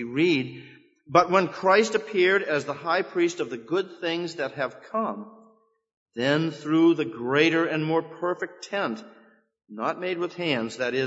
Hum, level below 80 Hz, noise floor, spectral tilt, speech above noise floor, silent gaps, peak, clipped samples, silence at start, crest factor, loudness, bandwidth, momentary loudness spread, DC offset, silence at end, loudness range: none; -74 dBFS; -60 dBFS; -5 dB/octave; 35 dB; 5.97-6.06 s; -4 dBFS; under 0.1%; 0 s; 22 dB; -25 LUFS; 8 kHz; 11 LU; under 0.1%; 0 s; 6 LU